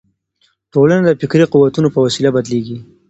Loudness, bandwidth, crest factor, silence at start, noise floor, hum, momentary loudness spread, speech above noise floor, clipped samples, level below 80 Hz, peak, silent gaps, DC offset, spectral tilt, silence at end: -13 LUFS; 8.2 kHz; 14 dB; 0.75 s; -61 dBFS; none; 9 LU; 48 dB; under 0.1%; -52 dBFS; 0 dBFS; none; under 0.1%; -6.5 dB/octave; 0.25 s